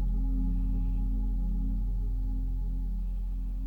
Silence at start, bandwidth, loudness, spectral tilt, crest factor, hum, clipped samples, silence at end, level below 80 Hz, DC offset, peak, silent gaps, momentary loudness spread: 0 s; 1.3 kHz; -34 LUFS; -10.5 dB/octave; 8 dB; none; under 0.1%; 0 s; -30 dBFS; under 0.1%; -20 dBFS; none; 4 LU